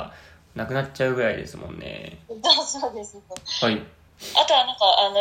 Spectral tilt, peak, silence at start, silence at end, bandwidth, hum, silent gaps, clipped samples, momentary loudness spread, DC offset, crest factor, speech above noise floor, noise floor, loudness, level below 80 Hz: -3 dB/octave; -2 dBFS; 0 s; 0 s; 16 kHz; none; none; under 0.1%; 20 LU; under 0.1%; 22 dB; 22 dB; -45 dBFS; -21 LUFS; -56 dBFS